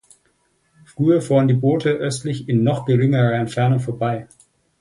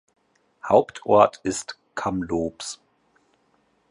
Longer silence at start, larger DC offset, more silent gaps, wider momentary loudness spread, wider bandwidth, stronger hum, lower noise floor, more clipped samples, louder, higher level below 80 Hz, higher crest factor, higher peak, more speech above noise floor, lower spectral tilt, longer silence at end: first, 1 s vs 0.65 s; neither; neither; second, 8 LU vs 17 LU; about the same, 11.5 kHz vs 11.5 kHz; neither; about the same, -64 dBFS vs -66 dBFS; neither; first, -19 LUFS vs -23 LUFS; about the same, -56 dBFS vs -54 dBFS; second, 14 dB vs 22 dB; about the same, -4 dBFS vs -2 dBFS; about the same, 46 dB vs 44 dB; first, -7.5 dB/octave vs -5 dB/octave; second, 0.55 s vs 1.15 s